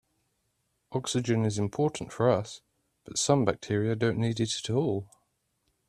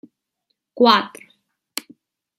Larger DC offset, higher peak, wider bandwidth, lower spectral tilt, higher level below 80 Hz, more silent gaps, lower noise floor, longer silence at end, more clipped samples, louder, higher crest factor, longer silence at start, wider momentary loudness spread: neither; second, -8 dBFS vs -2 dBFS; second, 13 kHz vs 16 kHz; first, -5 dB/octave vs -3.5 dB/octave; first, -62 dBFS vs -74 dBFS; neither; about the same, -76 dBFS vs -75 dBFS; second, 0.85 s vs 1.3 s; neither; second, -29 LUFS vs -16 LUFS; about the same, 22 dB vs 22 dB; first, 0.9 s vs 0.75 s; second, 9 LU vs 18 LU